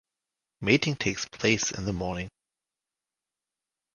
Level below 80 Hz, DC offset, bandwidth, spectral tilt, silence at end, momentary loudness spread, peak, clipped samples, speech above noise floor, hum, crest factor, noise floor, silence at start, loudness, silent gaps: -52 dBFS; under 0.1%; 11 kHz; -4 dB/octave; 1.65 s; 10 LU; -6 dBFS; under 0.1%; 62 dB; none; 26 dB; -90 dBFS; 0.6 s; -27 LUFS; none